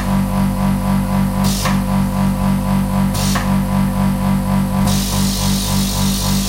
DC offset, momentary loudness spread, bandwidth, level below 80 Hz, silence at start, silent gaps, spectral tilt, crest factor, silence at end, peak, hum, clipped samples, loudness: under 0.1%; 1 LU; 16 kHz; -24 dBFS; 0 s; none; -5 dB/octave; 12 dB; 0 s; -4 dBFS; 50 Hz at -30 dBFS; under 0.1%; -16 LUFS